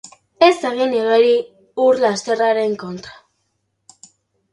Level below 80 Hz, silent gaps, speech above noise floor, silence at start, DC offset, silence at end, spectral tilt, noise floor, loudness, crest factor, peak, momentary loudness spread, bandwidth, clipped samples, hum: -64 dBFS; none; 54 dB; 0.05 s; under 0.1%; 1.4 s; -4 dB/octave; -70 dBFS; -16 LUFS; 18 dB; 0 dBFS; 14 LU; 11.5 kHz; under 0.1%; none